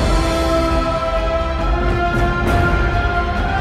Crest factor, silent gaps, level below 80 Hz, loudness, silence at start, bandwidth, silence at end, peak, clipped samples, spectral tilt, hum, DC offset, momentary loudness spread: 12 dB; none; -20 dBFS; -18 LUFS; 0 s; 13 kHz; 0 s; -4 dBFS; under 0.1%; -6 dB/octave; none; under 0.1%; 3 LU